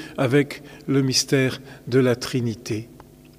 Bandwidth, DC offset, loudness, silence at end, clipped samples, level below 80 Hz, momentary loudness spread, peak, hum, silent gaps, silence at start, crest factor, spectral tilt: 15.5 kHz; under 0.1%; -22 LUFS; 0.45 s; under 0.1%; -56 dBFS; 12 LU; -6 dBFS; none; none; 0 s; 16 dB; -5 dB/octave